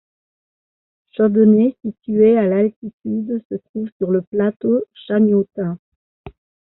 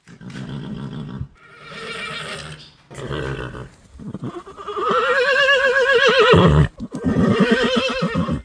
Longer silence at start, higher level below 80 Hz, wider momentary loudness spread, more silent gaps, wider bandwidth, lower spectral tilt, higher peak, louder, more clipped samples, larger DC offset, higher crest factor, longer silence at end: first, 1.2 s vs 0.1 s; second, -58 dBFS vs -36 dBFS; second, 15 LU vs 22 LU; first, 2.76-2.82 s, 2.93-2.99 s, 3.45-3.50 s, 3.69-3.74 s, 3.92-4.00 s, 4.27-4.32 s, 4.56-4.60 s, 5.79-6.24 s vs none; second, 4 kHz vs 10.5 kHz; first, -8.5 dB/octave vs -5.5 dB/octave; about the same, -4 dBFS vs -2 dBFS; about the same, -18 LUFS vs -17 LUFS; neither; neither; about the same, 16 dB vs 18 dB; first, 0.5 s vs 0 s